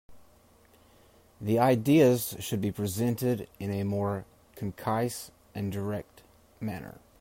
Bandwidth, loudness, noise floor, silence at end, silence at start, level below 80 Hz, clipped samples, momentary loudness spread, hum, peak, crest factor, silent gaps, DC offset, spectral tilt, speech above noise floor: 16 kHz; -29 LUFS; -60 dBFS; 0.2 s; 0.1 s; -62 dBFS; under 0.1%; 17 LU; none; -10 dBFS; 20 dB; none; under 0.1%; -6.5 dB/octave; 32 dB